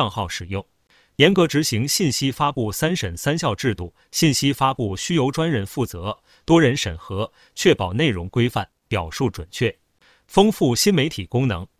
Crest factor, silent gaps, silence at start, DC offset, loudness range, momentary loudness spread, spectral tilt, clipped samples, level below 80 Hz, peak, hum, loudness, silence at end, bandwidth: 20 dB; none; 0 s; under 0.1%; 2 LU; 12 LU; -4.5 dB/octave; under 0.1%; -42 dBFS; 0 dBFS; none; -21 LUFS; 0.15 s; 16 kHz